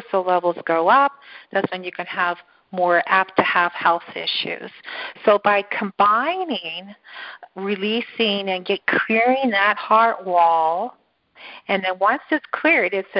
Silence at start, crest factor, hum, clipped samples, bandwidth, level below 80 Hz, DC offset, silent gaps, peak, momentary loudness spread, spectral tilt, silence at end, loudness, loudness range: 0 s; 20 dB; none; under 0.1%; 5.6 kHz; -68 dBFS; under 0.1%; none; -2 dBFS; 15 LU; -8.5 dB/octave; 0 s; -19 LUFS; 3 LU